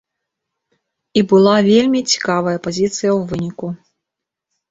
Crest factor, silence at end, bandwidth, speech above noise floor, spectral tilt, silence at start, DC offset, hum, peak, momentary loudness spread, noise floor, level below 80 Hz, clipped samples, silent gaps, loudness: 16 dB; 0.95 s; 7.8 kHz; 68 dB; -5 dB/octave; 1.15 s; under 0.1%; none; -2 dBFS; 14 LU; -82 dBFS; -54 dBFS; under 0.1%; none; -15 LUFS